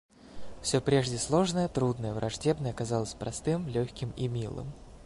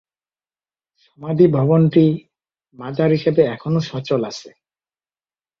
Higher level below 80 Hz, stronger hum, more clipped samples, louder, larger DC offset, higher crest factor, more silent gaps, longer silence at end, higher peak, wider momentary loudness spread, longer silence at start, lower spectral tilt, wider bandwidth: first, -52 dBFS vs -58 dBFS; neither; neither; second, -31 LUFS vs -17 LUFS; neither; about the same, 18 dB vs 18 dB; neither; second, 0 s vs 1.1 s; second, -12 dBFS vs -2 dBFS; second, 9 LU vs 15 LU; second, 0.2 s vs 1.2 s; second, -5.5 dB/octave vs -8.5 dB/octave; first, 11.5 kHz vs 7 kHz